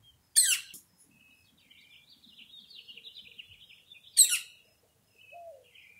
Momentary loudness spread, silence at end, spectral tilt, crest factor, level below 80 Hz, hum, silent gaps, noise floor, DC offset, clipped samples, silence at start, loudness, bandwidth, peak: 28 LU; 0.5 s; 4 dB/octave; 28 dB; -80 dBFS; none; none; -68 dBFS; under 0.1%; under 0.1%; 0.35 s; -24 LUFS; 16 kHz; -8 dBFS